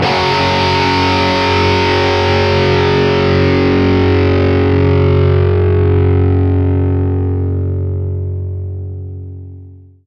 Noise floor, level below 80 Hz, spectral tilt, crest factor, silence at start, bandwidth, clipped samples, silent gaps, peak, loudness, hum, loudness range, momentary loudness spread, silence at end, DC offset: -36 dBFS; -38 dBFS; -7 dB/octave; 12 dB; 0 s; 6.8 kHz; under 0.1%; none; 0 dBFS; -12 LUFS; none; 5 LU; 10 LU; 0.3 s; under 0.1%